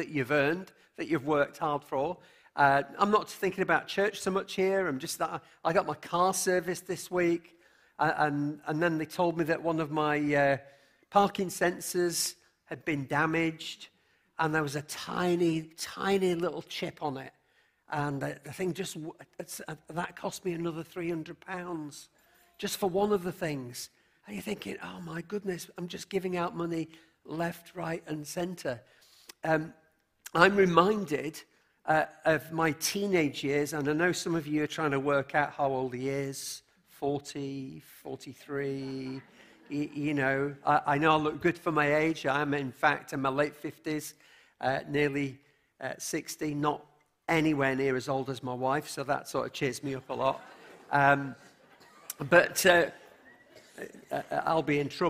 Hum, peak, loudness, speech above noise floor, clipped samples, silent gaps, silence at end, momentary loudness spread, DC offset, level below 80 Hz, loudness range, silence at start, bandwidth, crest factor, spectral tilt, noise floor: none; -4 dBFS; -30 LUFS; 39 dB; under 0.1%; none; 0 s; 15 LU; under 0.1%; -66 dBFS; 9 LU; 0 s; 15.5 kHz; 28 dB; -4.5 dB/octave; -70 dBFS